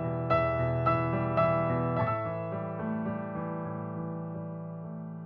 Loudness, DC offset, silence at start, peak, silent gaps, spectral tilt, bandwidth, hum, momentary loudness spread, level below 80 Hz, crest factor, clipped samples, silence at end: -31 LUFS; under 0.1%; 0 s; -14 dBFS; none; -10.5 dB/octave; 5.4 kHz; none; 12 LU; -54 dBFS; 16 dB; under 0.1%; 0 s